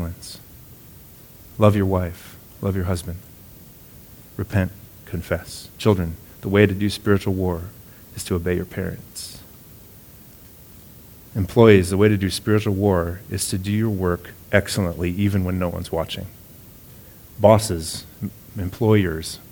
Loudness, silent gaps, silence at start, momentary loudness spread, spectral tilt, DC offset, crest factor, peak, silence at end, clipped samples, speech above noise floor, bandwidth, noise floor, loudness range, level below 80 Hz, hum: -21 LUFS; none; 0 s; 24 LU; -6 dB/octave; under 0.1%; 22 dB; 0 dBFS; 0.1 s; under 0.1%; 25 dB; 19.5 kHz; -45 dBFS; 9 LU; -44 dBFS; none